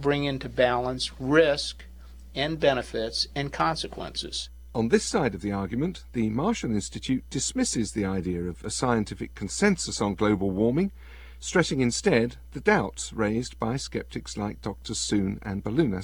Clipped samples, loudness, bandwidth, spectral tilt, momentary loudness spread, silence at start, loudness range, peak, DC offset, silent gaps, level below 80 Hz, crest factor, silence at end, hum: under 0.1%; -27 LUFS; 19 kHz; -4.5 dB/octave; 10 LU; 0 s; 3 LU; -6 dBFS; 0.2%; none; -44 dBFS; 20 dB; 0 s; none